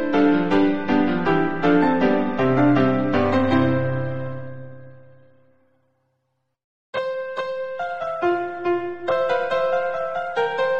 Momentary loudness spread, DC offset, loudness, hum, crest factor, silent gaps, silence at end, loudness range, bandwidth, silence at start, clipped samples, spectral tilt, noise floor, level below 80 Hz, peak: 10 LU; 1%; -21 LUFS; none; 16 dB; 6.64-6.93 s; 0 s; 14 LU; 7 kHz; 0 s; under 0.1%; -8 dB/octave; -73 dBFS; -54 dBFS; -6 dBFS